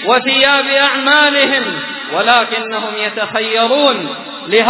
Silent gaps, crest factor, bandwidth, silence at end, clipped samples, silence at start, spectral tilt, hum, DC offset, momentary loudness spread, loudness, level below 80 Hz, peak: none; 14 dB; 4 kHz; 0 s; 0.2%; 0 s; -6.5 dB/octave; none; under 0.1%; 10 LU; -12 LUFS; -62 dBFS; 0 dBFS